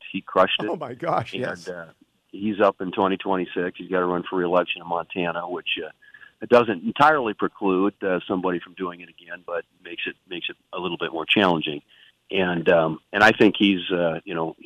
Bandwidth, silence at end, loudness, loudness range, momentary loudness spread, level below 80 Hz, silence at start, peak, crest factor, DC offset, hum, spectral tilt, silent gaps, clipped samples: 13 kHz; 0.15 s; -23 LUFS; 6 LU; 14 LU; -62 dBFS; 0 s; -4 dBFS; 18 dB; under 0.1%; none; -6 dB/octave; none; under 0.1%